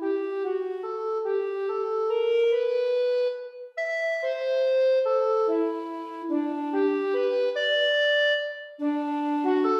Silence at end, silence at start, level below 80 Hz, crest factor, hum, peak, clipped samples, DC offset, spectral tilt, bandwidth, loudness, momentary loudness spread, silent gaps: 0 s; 0 s; -86 dBFS; 12 dB; none; -14 dBFS; under 0.1%; under 0.1%; -2.5 dB/octave; 7.6 kHz; -26 LUFS; 9 LU; none